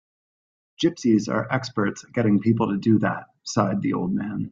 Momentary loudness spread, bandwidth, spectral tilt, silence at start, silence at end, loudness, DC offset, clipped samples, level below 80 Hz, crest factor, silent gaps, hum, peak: 6 LU; 7.6 kHz; -6.5 dB/octave; 0.8 s; 0 s; -23 LUFS; under 0.1%; under 0.1%; -58 dBFS; 18 dB; none; none; -6 dBFS